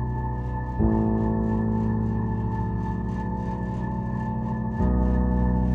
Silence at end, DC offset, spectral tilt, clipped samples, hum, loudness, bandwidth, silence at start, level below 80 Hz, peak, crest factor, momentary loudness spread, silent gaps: 0 s; under 0.1%; -11 dB/octave; under 0.1%; none; -26 LUFS; 3.3 kHz; 0 s; -30 dBFS; -10 dBFS; 16 dB; 6 LU; none